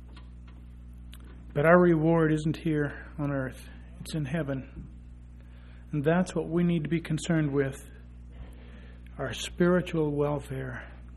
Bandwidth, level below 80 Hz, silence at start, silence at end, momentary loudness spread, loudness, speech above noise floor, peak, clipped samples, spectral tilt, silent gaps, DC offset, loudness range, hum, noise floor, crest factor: 12.5 kHz; -46 dBFS; 0 s; 0 s; 25 LU; -28 LUFS; 20 dB; -6 dBFS; under 0.1%; -7 dB/octave; none; under 0.1%; 6 LU; 60 Hz at -45 dBFS; -47 dBFS; 24 dB